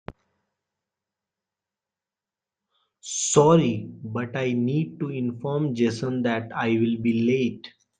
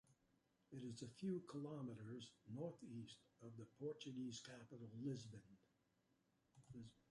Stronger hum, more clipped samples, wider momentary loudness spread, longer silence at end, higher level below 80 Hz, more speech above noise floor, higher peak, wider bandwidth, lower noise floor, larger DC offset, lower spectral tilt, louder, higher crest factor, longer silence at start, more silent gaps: neither; neither; about the same, 13 LU vs 12 LU; about the same, 0.3 s vs 0.2 s; first, -62 dBFS vs -86 dBFS; first, 67 dB vs 31 dB; first, -4 dBFS vs -38 dBFS; second, 9.6 kHz vs 11.5 kHz; first, -90 dBFS vs -84 dBFS; neither; about the same, -5.5 dB/octave vs -6 dB/octave; first, -24 LUFS vs -54 LUFS; about the same, 22 dB vs 18 dB; first, 3.05 s vs 0.05 s; neither